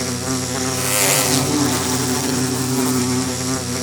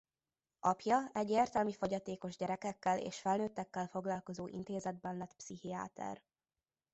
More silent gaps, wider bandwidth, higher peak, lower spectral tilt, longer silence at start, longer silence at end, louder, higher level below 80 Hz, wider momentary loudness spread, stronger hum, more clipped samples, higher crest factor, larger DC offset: neither; first, over 20 kHz vs 8 kHz; first, 0 dBFS vs -18 dBFS; second, -3 dB/octave vs -5 dB/octave; second, 0 s vs 0.65 s; second, 0 s vs 0.75 s; first, -18 LUFS vs -39 LUFS; first, -52 dBFS vs -72 dBFS; second, 7 LU vs 12 LU; neither; neither; about the same, 18 dB vs 20 dB; neither